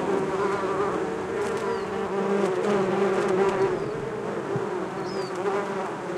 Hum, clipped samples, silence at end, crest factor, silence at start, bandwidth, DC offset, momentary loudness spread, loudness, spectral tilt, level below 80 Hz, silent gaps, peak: none; under 0.1%; 0 s; 16 dB; 0 s; 12 kHz; under 0.1%; 7 LU; -26 LUFS; -6 dB/octave; -58 dBFS; none; -10 dBFS